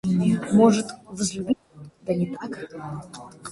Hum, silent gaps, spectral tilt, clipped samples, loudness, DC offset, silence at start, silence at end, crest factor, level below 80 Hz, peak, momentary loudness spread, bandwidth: none; none; -6 dB/octave; under 0.1%; -23 LUFS; under 0.1%; 0.05 s; 0 s; 18 dB; -56 dBFS; -6 dBFS; 19 LU; 11.5 kHz